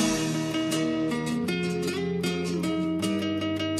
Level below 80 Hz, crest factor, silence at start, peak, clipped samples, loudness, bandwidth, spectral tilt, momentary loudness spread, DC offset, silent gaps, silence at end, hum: -56 dBFS; 16 dB; 0 s; -12 dBFS; under 0.1%; -28 LUFS; 15.5 kHz; -5 dB/octave; 2 LU; under 0.1%; none; 0 s; none